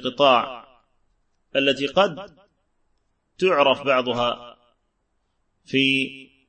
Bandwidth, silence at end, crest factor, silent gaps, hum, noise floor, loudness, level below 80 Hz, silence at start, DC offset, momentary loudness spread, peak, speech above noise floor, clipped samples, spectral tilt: 8.8 kHz; 0.25 s; 22 dB; none; none; -71 dBFS; -21 LUFS; -60 dBFS; 0 s; under 0.1%; 13 LU; -2 dBFS; 51 dB; under 0.1%; -4.5 dB/octave